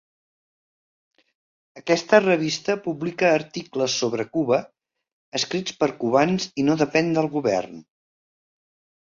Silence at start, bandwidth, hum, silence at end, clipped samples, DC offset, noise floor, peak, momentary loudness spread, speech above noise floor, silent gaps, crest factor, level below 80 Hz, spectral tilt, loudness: 1.75 s; 7.6 kHz; none; 1.2 s; under 0.1%; under 0.1%; under -90 dBFS; -2 dBFS; 9 LU; over 68 dB; 5.13-5.32 s; 22 dB; -64 dBFS; -4.5 dB/octave; -22 LUFS